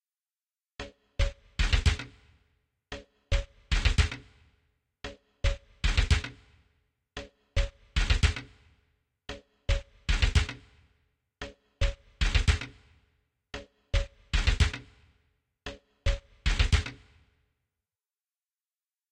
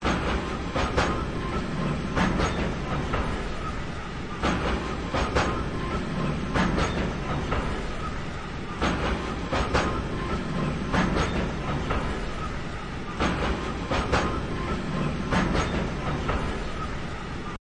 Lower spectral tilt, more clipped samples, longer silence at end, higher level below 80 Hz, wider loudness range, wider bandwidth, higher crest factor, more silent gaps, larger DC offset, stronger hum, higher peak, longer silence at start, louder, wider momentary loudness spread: second, -4 dB/octave vs -5.5 dB/octave; neither; first, 2.15 s vs 0.05 s; about the same, -32 dBFS vs -34 dBFS; about the same, 3 LU vs 1 LU; about the same, 10 kHz vs 10.5 kHz; about the same, 22 dB vs 18 dB; neither; neither; neither; about the same, -10 dBFS vs -10 dBFS; first, 0.8 s vs 0 s; about the same, -30 LUFS vs -28 LUFS; first, 18 LU vs 8 LU